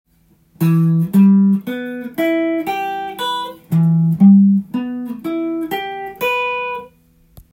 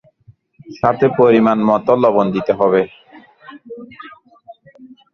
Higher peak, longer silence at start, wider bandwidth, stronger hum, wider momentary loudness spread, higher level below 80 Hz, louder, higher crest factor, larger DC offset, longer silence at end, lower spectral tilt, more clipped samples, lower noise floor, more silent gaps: about the same, -2 dBFS vs 0 dBFS; about the same, 0.6 s vs 0.7 s; first, 16.5 kHz vs 6.6 kHz; neither; second, 14 LU vs 24 LU; about the same, -58 dBFS vs -56 dBFS; about the same, -16 LUFS vs -14 LUFS; about the same, 14 dB vs 16 dB; neither; first, 0.65 s vs 0.3 s; about the same, -8 dB/octave vs -8.5 dB/octave; neither; first, -55 dBFS vs -50 dBFS; neither